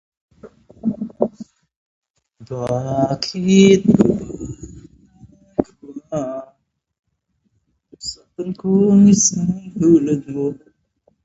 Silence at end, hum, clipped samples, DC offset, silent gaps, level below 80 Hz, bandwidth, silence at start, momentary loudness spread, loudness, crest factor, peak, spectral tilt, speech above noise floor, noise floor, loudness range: 0.7 s; none; under 0.1%; under 0.1%; 1.77-2.02 s, 2.10-2.14 s, 6.99-7.03 s; -50 dBFS; 8 kHz; 0.45 s; 21 LU; -17 LUFS; 18 dB; 0 dBFS; -5.5 dB/octave; 54 dB; -69 dBFS; 13 LU